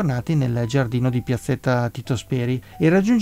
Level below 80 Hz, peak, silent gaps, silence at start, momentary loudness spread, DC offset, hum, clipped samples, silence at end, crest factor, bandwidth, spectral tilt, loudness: -48 dBFS; -6 dBFS; none; 0 s; 6 LU; under 0.1%; none; under 0.1%; 0 s; 14 dB; 15.5 kHz; -7.5 dB/octave; -22 LUFS